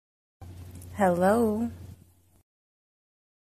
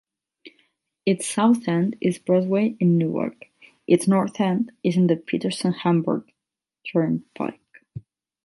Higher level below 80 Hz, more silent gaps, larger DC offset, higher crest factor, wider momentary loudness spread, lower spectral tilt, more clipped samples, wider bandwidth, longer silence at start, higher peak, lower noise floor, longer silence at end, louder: first, -58 dBFS vs -66 dBFS; neither; neither; about the same, 18 dB vs 18 dB; first, 24 LU vs 12 LU; about the same, -7 dB/octave vs -6.5 dB/octave; neither; first, 14.5 kHz vs 11.5 kHz; about the same, 0.4 s vs 0.45 s; second, -12 dBFS vs -4 dBFS; second, -57 dBFS vs -86 dBFS; first, 1.55 s vs 0.45 s; second, -25 LUFS vs -22 LUFS